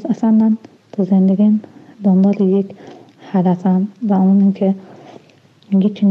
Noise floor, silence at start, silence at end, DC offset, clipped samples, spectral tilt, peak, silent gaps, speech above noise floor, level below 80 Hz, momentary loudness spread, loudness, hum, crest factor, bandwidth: -49 dBFS; 0 s; 0 s; under 0.1%; under 0.1%; -10.5 dB/octave; -6 dBFS; none; 35 dB; -74 dBFS; 9 LU; -15 LUFS; none; 10 dB; 4 kHz